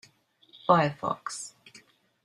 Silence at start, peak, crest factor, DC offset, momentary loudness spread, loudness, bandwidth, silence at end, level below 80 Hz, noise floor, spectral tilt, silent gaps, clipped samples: 0.65 s; -6 dBFS; 24 dB; under 0.1%; 15 LU; -28 LUFS; 12.5 kHz; 0.75 s; -70 dBFS; -62 dBFS; -5 dB/octave; none; under 0.1%